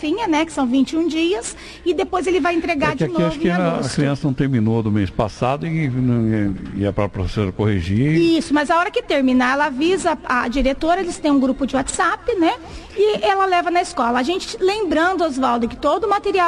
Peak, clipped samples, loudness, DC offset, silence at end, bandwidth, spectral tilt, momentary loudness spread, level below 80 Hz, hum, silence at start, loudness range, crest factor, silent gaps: -6 dBFS; under 0.1%; -19 LUFS; under 0.1%; 0 s; 12 kHz; -6 dB/octave; 5 LU; -38 dBFS; none; 0 s; 2 LU; 12 dB; none